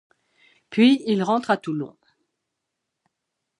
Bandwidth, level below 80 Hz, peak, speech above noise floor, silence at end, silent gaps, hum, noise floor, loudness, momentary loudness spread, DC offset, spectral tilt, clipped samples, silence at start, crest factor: 10.5 kHz; -74 dBFS; -6 dBFS; 61 dB; 1.7 s; none; none; -81 dBFS; -21 LUFS; 13 LU; under 0.1%; -6 dB/octave; under 0.1%; 0.7 s; 18 dB